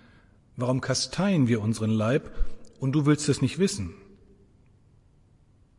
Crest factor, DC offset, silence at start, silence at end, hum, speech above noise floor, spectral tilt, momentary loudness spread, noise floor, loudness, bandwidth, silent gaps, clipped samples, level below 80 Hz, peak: 18 dB; under 0.1%; 0.55 s; 1.8 s; none; 35 dB; -5.5 dB/octave; 15 LU; -59 dBFS; -26 LUFS; 11.5 kHz; none; under 0.1%; -42 dBFS; -10 dBFS